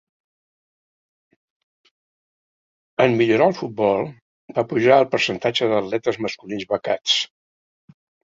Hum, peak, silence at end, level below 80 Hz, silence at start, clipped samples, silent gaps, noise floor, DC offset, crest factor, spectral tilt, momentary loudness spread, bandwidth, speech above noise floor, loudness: none; -2 dBFS; 1 s; -64 dBFS; 3 s; under 0.1%; 4.22-4.48 s; under -90 dBFS; under 0.1%; 20 dB; -4.5 dB/octave; 12 LU; 7.8 kHz; over 71 dB; -20 LUFS